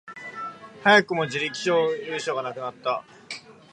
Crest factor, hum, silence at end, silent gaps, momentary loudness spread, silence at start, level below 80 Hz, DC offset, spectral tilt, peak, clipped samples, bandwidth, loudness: 22 dB; none; 0.2 s; none; 20 LU; 0.05 s; -74 dBFS; under 0.1%; -4 dB/octave; -2 dBFS; under 0.1%; 11 kHz; -24 LUFS